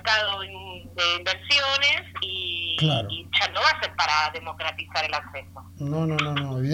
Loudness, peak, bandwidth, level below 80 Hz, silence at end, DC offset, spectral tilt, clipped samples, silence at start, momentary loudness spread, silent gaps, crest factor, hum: -24 LUFS; -6 dBFS; 16 kHz; -56 dBFS; 0 s; under 0.1%; -4 dB/octave; under 0.1%; 0 s; 11 LU; none; 18 dB; none